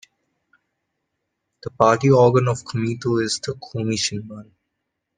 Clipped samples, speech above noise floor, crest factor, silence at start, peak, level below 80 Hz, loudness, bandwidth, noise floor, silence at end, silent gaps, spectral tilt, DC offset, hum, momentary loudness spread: under 0.1%; 59 dB; 22 dB; 1.65 s; 0 dBFS; -58 dBFS; -20 LUFS; 10 kHz; -78 dBFS; 0.75 s; none; -5.5 dB/octave; under 0.1%; none; 22 LU